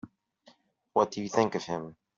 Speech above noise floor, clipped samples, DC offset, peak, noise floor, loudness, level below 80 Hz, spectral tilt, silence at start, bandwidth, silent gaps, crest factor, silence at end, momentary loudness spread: 34 dB; under 0.1%; under 0.1%; -10 dBFS; -63 dBFS; -30 LUFS; -72 dBFS; -5 dB/octave; 0.05 s; 7.6 kHz; none; 22 dB; 0.25 s; 9 LU